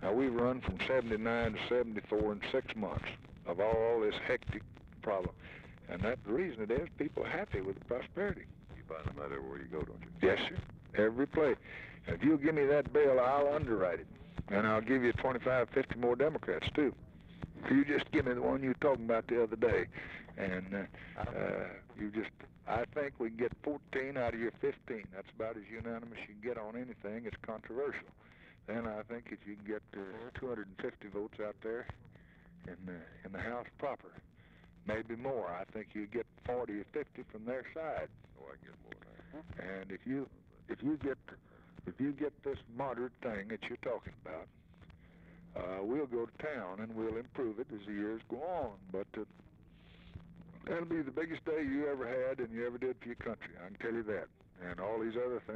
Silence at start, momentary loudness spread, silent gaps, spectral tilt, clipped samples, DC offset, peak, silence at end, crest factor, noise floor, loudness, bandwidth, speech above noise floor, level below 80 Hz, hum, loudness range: 0 s; 17 LU; none; -8 dB/octave; under 0.1%; under 0.1%; -18 dBFS; 0 s; 18 dB; -61 dBFS; -37 LUFS; 8.4 kHz; 24 dB; -58 dBFS; none; 12 LU